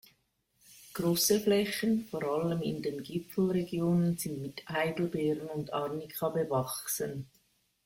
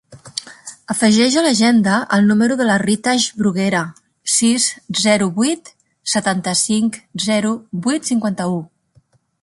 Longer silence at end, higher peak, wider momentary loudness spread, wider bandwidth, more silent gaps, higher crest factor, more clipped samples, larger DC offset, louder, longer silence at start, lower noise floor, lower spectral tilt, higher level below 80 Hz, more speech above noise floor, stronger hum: second, 0.6 s vs 0.75 s; second, -14 dBFS vs -2 dBFS; second, 10 LU vs 14 LU; first, 16.5 kHz vs 11.5 kHz; neither; about the same, 18 dB vs 16 dB; neither; neither; second, -32 LUFS vs -16 LUFS; first, 0.7 s vs 0.1 s; first, -74 dBFS vs -56 dBFS; first, -5 dB/octave vs -3.5 dB/octave; second, -66 dBFS vs -58 dBFS; about the same, 43 dB vs 40 dB; neither